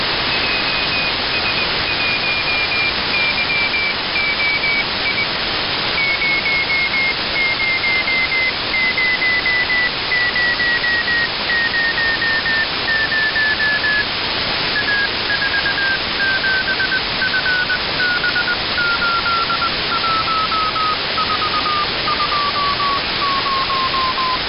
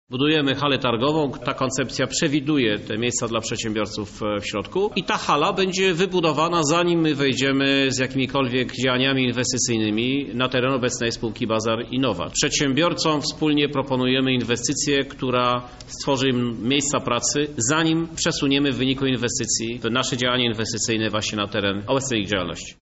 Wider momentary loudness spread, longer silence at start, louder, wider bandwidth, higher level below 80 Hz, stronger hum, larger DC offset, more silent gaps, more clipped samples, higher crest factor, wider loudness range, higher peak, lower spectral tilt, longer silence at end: second, 2 LU vs 5 LU; about the same, 0 s vs 0.1 s; first, -16 LUFS vs -21 LUFS; second, 5.6 kHz vs 8.2 kHz; first, -40 dBFS vs -48 dBFS; neither; neither; neither; neither; about the same, 10 dB vs 14 dB; about the same, 2 LU vs 3 LU; about the same, -8 dBFS vs -8 dBFS; first, -7.5 dB/octave vs -3.5 dB/octave; about the same, 0 s vs 0.1 s